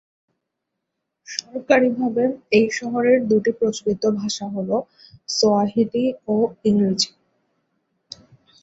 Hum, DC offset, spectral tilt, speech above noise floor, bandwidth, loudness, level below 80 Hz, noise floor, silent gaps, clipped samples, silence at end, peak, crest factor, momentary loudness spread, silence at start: none; under 0.1%; -4.5 dB/octave; 60 dB; 8 kHz; -20 LUFS; -62 dBFS; -80 dBFS; none; under 0.1%; 1.55 s; -2 dBFS; 18 dB; 13 LU; 1.3 s